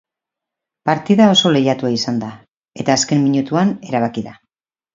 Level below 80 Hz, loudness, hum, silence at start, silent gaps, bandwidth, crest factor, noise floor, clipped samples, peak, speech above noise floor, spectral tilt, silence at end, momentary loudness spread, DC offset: -60 dBFS; -16 LUFS; none; 0.85 s; 2.57-2.61 s; 7.6 kHz; 18 dB; -84 dBFS; under 0.1%; 0 dBFS; 69 dB; -5 dB/octave; 0.6 s; 13 LU; under 0.1%